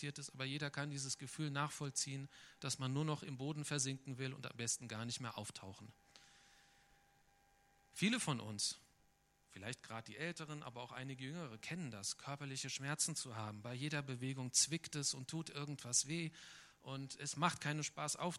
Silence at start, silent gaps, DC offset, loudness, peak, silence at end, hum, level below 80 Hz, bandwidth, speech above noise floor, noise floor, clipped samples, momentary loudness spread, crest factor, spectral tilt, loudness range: 0 s; none; under 0.1%; -42 LUFS; -18 dBFS; 0 s; none; -80 dBFS; 14.5 kHz; 31 dB; -75 dBFS; under 0.1%; 13 LU; 26 dB; -3 dB/octave; 8 LU